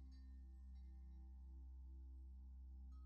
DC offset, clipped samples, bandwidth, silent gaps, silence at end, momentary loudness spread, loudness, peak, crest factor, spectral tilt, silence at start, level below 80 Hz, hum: under 0.1%; under 0.1%; 5.6 kHz; none; 0 s; 1 LU; -60 LUFS; -52 dBFS; 6 dB; -9 dB/octave; 0 s; -58 dBFS; none